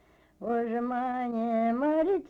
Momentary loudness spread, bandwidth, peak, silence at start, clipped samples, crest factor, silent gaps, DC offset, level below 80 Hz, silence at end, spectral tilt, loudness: 5 LU; 4.9 kHz; -18 dBFS; 0.4 s; under 0.1%; 10 dB; none; under 0.1%; -64 dBFS; 0 s; -8.5 dB/octave; -29 LUFS